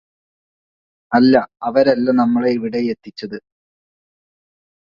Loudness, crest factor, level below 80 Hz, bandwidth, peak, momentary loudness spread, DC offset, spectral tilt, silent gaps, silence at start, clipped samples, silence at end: -16 LUFS; 18 dB; -60 dBFS; 5.8 kHz; 0 dBFS; 17 LU; under 0.1%; -7.5 dB/octave; none; 1.1 s; under 0.1%; 1.45 s